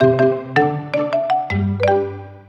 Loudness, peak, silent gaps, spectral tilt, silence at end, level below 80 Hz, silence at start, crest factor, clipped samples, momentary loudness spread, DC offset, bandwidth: -18 LUFS; -2 dBFS; none; -8 dB/octave; 0.05 s; -56 dBFS; 0 s; 16 dB; under 0.1%; 4 LU; under 0.1%; 7 kHz